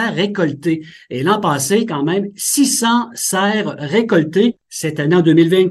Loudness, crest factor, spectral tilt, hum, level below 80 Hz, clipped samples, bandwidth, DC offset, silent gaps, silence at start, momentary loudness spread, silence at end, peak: -16 LUFS; 16 dB; -4.5 dB/octave; none; -60 dBFS; under 0.1%; 13 kHz; under 0.1%; none; 0 s; 9 LU; 0 s; 0 dBFS